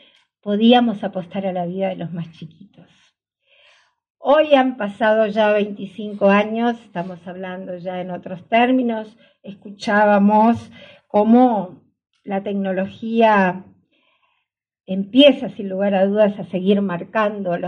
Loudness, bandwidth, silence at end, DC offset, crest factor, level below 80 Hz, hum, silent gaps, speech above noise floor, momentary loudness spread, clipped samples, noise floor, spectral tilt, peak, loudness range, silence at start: -18 LUFS; 7 kHz; 0 s; under 0.1%; 18 dB; -68 dBFS; none; 4.10-4.15 s; 55 dB; 16 LU; under 0.1%; -73 dBFS; -7 dB/octave; 0 dBFS; 5 LU; 0.45 s